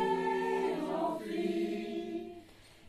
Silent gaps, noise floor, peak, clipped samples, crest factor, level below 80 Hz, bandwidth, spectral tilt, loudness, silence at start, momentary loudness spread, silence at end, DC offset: none; -56 dBFS; -20 dBFS; under 0.1%; 14 dB; -68 dBFS; 14 kHz; -6 dB/octave; -35 LUFS; 0 s; 10 LU; 0 s; under 0.1%